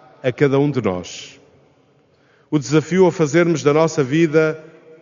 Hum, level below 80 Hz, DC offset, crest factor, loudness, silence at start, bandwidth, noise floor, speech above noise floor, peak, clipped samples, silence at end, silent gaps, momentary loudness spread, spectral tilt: none; -62 dBFS; under 0.1%; 18 dB; -17 LUFS; 0.25 s; 7.4 kHz; -56 dBFS; 39 dB; 0 dBFS; under 0.1%; 0.4 s; none; 11 LU; -6.5 dB/octave